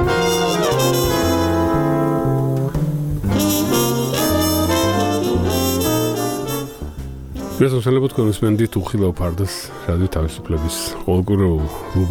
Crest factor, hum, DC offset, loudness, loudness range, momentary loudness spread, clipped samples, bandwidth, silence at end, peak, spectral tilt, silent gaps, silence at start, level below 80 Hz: 16 dB; none; under 0.1%; -18 LUFS; 3 LU; 7 LU; under 0.1%; 19.5 kHz; 0 s; -2 dBFS; -5.5 dB/octave; none; 0 s; -32 dBFS